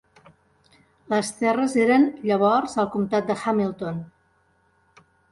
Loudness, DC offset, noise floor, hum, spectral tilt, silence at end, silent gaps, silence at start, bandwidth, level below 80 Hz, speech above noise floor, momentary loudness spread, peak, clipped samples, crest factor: -22 LUFS; under 0.1%; -64 dBFS; none; -5.5 dB/octave; 1.25 s; none; 1.1 s; 11.5 kHz; -64 dBFS; 42 dB; 9 LU; -6 dBFS; under 0.1%; 18 dB